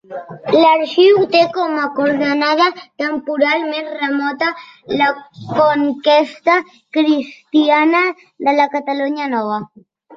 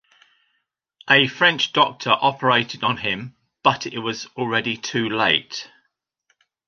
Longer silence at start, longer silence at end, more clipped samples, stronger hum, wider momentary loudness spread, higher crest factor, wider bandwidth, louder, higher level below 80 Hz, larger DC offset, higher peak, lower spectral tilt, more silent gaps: second, 0.1 s vs 1.05 s; second, 0 s vs 1 s; neither; neither; about the same, 11 LU vs 11 LU; second, 14 dB vs 22 dB; about the same, 7.2 kHz vs 7.2 kHz; first, -15 LUFS vs -20 LUFS; about the same, -64 dBFS vs -64 dBFS; neither; about the same, 0 dBFS vs 0 dBFS; first, -5.5 dB/octave vs -3.5 dB/octave; neither